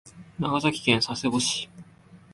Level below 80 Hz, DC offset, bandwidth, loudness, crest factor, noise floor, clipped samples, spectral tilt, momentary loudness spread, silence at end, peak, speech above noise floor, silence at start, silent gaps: -60 dBFS; under 0.1%; 11.5 kHz; -25 LUFS; 22 dB; -52 dBFS; under 0.1%; -3.5 dB/octave; 13 LU; 0.15 s; -6 dBFS; 26 dB; 0.05 s; none